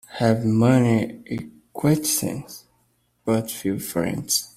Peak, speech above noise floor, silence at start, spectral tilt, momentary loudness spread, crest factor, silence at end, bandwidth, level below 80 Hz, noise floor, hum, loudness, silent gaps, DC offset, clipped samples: -4 dBFS; 45 dB; 0.1 s; -5 dB/octave; 16 LU; 18 dB; 0.1 s; 16 kHz; -56 dBFS; -66 dBFS; none; -22 LUFS; none; under 0.1%; under 0.1%